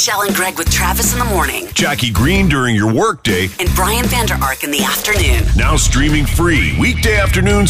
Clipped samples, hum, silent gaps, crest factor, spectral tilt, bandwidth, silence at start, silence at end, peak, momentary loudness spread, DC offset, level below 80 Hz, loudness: under 0.1%; none; none; 10 dB; -4 dB/octave; 15.5 kHz; 0 s; 0 s; -2 dBFS; 3 LU; under 0.1%; -20 dBFS; -13 LUFS